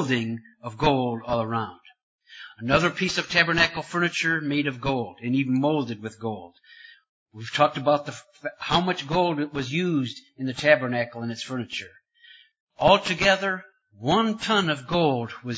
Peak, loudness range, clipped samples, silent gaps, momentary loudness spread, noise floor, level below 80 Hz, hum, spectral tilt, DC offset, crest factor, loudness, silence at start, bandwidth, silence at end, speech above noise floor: -2 dBFS; 4 LU; under 0.1%; 2.03-2.19 s, 7.09-7.26 s, 12.60-12.67 s; 13 LU; -54 dBFS; -54 dBFS; none; -5 dB/octave; under 0.1%; 24 dB; -24 LUFS; 0 s; 8 kHz; 0 s; 29 dB